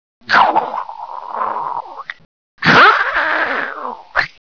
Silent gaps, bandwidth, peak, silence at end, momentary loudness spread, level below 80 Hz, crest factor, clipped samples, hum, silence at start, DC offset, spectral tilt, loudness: 2.25-2.58 s; 5.4 kHz; -2 dBFS; 0.2 s; 20 LU; -52 dBFS; 14 dB; under 0.1%; none; 0.3 s; 0.4%; -4.5 dB/octave; -14 LUFS